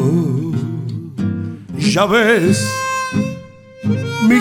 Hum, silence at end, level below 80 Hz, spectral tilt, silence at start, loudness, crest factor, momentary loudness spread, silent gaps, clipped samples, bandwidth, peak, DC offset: none; 0 s; -50 dBFS; -5.5 dB/octave; 0 s; -17 LUFS; 16 dB; 13 LU; none; under 0.1%; 17.5 kHz; 0 dBFS; under 0.1%